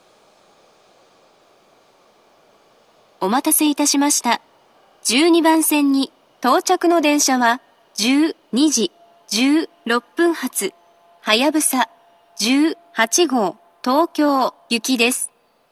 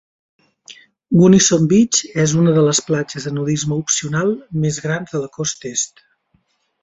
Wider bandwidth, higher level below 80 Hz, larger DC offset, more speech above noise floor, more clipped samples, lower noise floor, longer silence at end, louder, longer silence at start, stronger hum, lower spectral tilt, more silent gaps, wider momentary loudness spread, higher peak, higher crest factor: first, 14.5 kHz vs 8.2 kHz; second, -82 dBFS vs -54 dBFS; neither; second, 38 dB vs 47 dB; neither; second, -54 dBFS vs -63 dBFS; second, 0.45 s vs 0.95 s; about the same, -18 LUFS vs -16 LUFS; first, 3.2 s vs 0.7 s; neither; second, -2 dB/octave vs -4.5 dB/octave; neither; about the same, 9 LU vs 11 LU; about the same, 0 dBFS vs -2 dBFS; about the same, 20 dB vs 16 dB